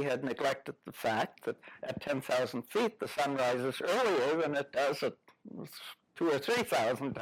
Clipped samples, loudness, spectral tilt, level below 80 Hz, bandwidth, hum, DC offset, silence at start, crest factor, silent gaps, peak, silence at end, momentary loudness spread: under 0.1%; -33 LUFS; -4.5 dB/octave; -76 dBFS; 17.5 kHz; none; under 0.1%; 0 s; 12 dB; none; -20 dBFS; 0 s; 15 LU